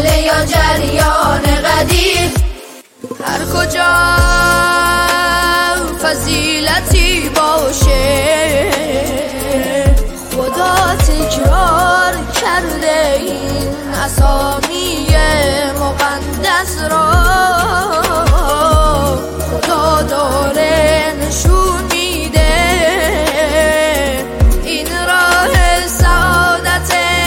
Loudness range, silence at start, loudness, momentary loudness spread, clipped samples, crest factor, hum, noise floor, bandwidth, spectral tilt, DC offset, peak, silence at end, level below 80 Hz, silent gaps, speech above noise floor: 2 LU; 0 s; -12 LUFS; 6 LU; under 0.1%; 12 dB; none; -34 dBFS; 17 kHz; -4 dB/octave; under 0.1%; 0 dBFS; 0 s; -18 dBFS; none; 22 dB